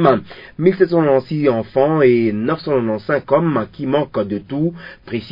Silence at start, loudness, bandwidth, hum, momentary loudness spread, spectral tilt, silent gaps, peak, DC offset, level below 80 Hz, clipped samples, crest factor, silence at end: 0 s; -17 LUFS; 5.4 kHz; none; 9 LU; -10 dB/octave; none; 0 dBFS; under 0.1%; -52 dBFS; under 0.1%; 16 dB; 0 s